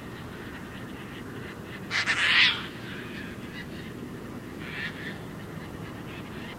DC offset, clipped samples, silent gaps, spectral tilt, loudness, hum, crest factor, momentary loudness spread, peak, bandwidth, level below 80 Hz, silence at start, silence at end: under 0.1%; under 0.1%; none; -3.5 dB/octave; -30 LUFS; none; 26 dB; 18 LU; -6 dBFS; 16 kHz; -54 dBFS; 0 s; 0 s